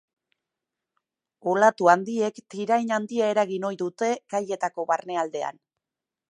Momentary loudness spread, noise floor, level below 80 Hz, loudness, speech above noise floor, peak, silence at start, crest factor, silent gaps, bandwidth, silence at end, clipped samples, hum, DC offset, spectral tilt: 10 LU; -88 dBFS; -82 dBFS; -25 LUFS; 64 dB; -4 dBFS; 1.45 s; 22 dB; none; 10 kHz; 0.8 s; under 0.1%; none; under 0.1%; -5 dB/octave